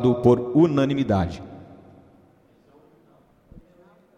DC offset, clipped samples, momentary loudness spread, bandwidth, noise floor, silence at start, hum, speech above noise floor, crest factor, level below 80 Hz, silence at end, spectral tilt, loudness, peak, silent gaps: under 0.1%; under 0.1%; 22 LU; 8.2 kHz; -57 dBFS; 0 s; none; 38 dB; 20 dB; -50 dBFS; 2.55 s; -8.5 dB/octave; -20 LUFS; -4 dBFS; none